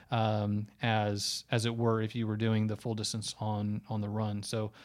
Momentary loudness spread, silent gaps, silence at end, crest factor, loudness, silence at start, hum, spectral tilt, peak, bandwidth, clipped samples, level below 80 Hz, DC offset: 5 LU; none; 0 s; 18 dB; -33 LUFS; 0 s; none; -5.5 dB/octave; -14 dBFS; 14 kHz; under 0.1%; -68 dBFS; under 0.1%